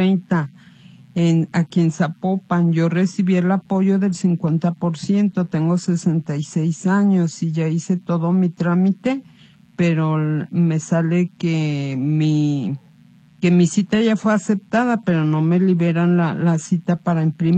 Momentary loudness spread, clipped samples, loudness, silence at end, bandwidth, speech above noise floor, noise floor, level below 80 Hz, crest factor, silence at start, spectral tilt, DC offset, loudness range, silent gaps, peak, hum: 5 LU; under 0.1%; -19 LUFS; 0 s; 9 kHz; 31 dB; -49 dBFS; -62 dBFS; 14 dB; 0 s; -7.5 dB/octave; under 0.1%; 2 LU; none; -4 dBFS; none